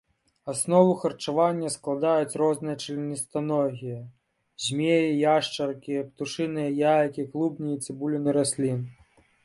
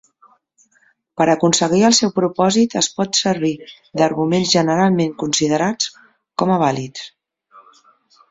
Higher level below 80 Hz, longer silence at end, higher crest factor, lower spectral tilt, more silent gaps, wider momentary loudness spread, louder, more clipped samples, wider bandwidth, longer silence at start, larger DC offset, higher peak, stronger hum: second, -68 dBFS vs -58 dBFS; second, 0.5 s vs 0.7 s; about the same, 20 dB vs 16 dB; about the same, -5 dB/octave vs -4 dB/octave; neither; second, 10 LU vs 15 LU; second, -26 LUFS vs -17 LUFS; neither; first, 11.5 kHz vs 8 kHz; second, 0.45 s vs 1.15 s; neither; second, -6 dBFS vs -2 dBFS; neither